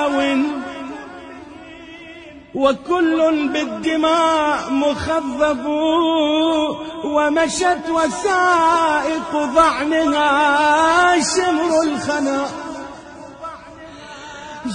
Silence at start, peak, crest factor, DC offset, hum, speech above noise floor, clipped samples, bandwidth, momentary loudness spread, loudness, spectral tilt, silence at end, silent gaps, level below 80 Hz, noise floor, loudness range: 0 s; -2 dBFS; 16 dB; under 0.1%; none; 22 dB; under 0.1%; 10.5 kHz; 22 LU; -17 LUFS; -3 dB/octave; 0 s; none; -50 dBFS; -38 dBFS; 6 LU